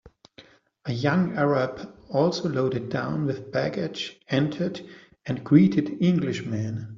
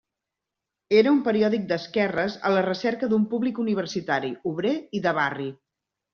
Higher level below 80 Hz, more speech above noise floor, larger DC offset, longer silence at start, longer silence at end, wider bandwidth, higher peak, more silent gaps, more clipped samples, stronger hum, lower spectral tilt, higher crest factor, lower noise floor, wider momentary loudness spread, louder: first, -62 dBFS vs -68 dBFS; second, 29 dB vs 62 dB; neither; second, 0.05 s vs 0.9 s; second, 0 s vs 0.6 s; about the same, 7.4 kHz vs 6.8 kHz; about the same, -4 dBFS vs -6 dBFS; neither; neither; neither; first, -6.5 dB/octave vs -4.5 dB/octave; about the same, 20 dB vs 18 dB; second, -54 dBFS vs -86 dBFS; first, 12 LU vs 7 LU; about the same, -25 LUFS vs -24 LUFS